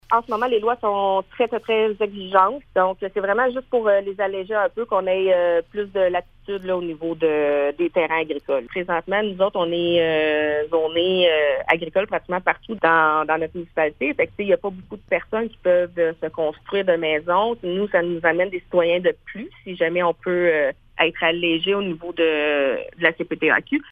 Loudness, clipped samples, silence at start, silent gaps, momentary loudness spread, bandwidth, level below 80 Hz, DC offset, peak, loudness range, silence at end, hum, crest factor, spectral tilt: -21 LUFS; under 0.1%; 0.1 s; none; 7 LU; 4.9 kHz; -54 dBFS; under 0.1%; 0 dBFS; 3 LU; 0 s; none; 20 dB; -7 dB/octave